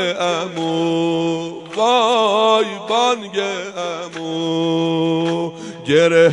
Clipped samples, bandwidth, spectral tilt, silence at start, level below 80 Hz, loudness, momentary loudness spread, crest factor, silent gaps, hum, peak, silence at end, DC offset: under 0.1%; 10.5 kHz; -4.5 dB/octave; 0 s; -66 dBFS; -18 LUFS; 11 LU; 16 dB; none; none; -2 dBFS; 0 s; under 0.1%